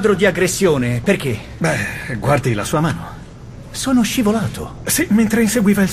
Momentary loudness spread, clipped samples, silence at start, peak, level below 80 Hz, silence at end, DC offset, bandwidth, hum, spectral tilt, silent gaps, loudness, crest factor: 12 LU; under 0.1%; 0 s; -2 dBFS; -38 dBFS; 0 s; under 0.1%; 15.5 kHz; none; -5 dB/octave; none; -17 LUFS; 14 dB